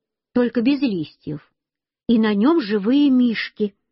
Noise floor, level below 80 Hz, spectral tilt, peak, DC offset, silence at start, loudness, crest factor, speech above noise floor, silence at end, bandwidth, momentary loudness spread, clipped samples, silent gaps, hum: -85 dBFS; -60 dBFS; -5 dB/octave; -6 dBFS; under 0.1%; 0.35 s; -19 LUFS; 14 dB; 67 dB; 0.2 s; 5.8 kHz; 16 LU; under 0.1%; none; none